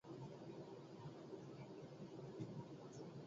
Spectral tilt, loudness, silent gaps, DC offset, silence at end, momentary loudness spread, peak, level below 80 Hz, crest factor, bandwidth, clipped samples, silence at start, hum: -7 dB/octave; -55 LUFS; none; under 0.1%; 0 s; 4 LU; -36 dBFS; -82 dBFS; 18 dB; 7.6 kHz; under 0.1%; 0.05 s; none